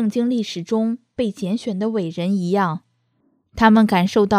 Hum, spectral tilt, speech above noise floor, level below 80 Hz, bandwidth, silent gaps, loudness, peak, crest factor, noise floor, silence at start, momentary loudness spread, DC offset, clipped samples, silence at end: none; -6.5 dB/octave; 46 dB; -50 dBFS; 14 kHz; none; -20 LUFS; 0 dBFS; 18 dB; -65 dBFS; 0 s; 10 LU; under 0.1%; under 0.1%; 0 s